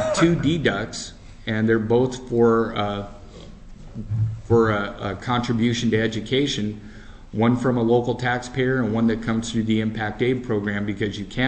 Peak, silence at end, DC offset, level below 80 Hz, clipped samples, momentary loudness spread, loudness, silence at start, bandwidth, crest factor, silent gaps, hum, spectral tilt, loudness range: -6 dBFS; 0 s; under 0.1%; -42 dBFS; under 0.1%; 13 LU; -22 LUFS; 0 s; 8.6 kHz; 16 dB; none; none; -6 dB/octave; 2 LU